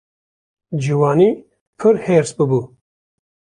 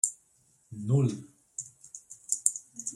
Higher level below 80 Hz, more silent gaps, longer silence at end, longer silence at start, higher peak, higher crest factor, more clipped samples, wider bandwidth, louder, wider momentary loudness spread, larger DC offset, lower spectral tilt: first, -58 dBFS vs -70 dBFS; first, 1.61-1.73 s vs none; first, 0.75 s vs 0 s; first, 0.7 s vs 0.05 s; about the same, -2 dBFS vs -2 dBFS; second, 16 dB vs 30 dB; neither; second, 10.5 kHz vs 15 kHz; first, -16 LUFS vs -30 LUFS; second, 10 LU vs 18 LU; neither; first, -7.5 dB/octave vs -5.5 dB/octave